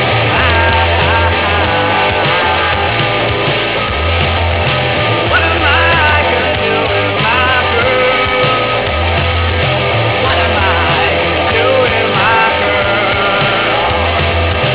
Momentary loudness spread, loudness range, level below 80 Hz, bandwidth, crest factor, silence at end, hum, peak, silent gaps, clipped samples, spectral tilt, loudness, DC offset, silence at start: 3 LU; 1 LU; -24 dBFS; 4 kHz; 8 dB; 0 s; none; -4 dBFS; none; under 0.1%; -8.5 dB/octave; -11 LUFS; 0.9%; 0 s